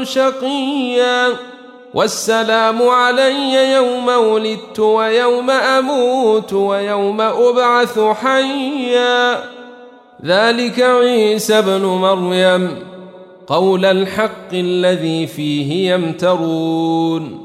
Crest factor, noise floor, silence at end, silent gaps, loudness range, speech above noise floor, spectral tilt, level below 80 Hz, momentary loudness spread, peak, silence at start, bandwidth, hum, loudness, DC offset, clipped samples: 12 dB; -39 dBFS; 0 s; none; 3 LU; 25 dB; -4.5 dB/octave; -64 dBFS; 7 LU; -2 dBFS; 0 s; 15.5 kHz; none; -14 LUFS; under 0.1%; under 0.1%